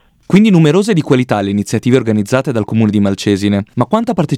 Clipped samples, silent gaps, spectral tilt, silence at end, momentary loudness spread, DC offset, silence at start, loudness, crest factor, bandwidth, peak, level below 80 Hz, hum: 0.2%; none; -7 dB/octave; 0 s; 6 LU; under 0.1%; 0.3 s; -13 LUFS; 12 dB; 13.5 kHz; 0 dBFS; -50 dBFS; none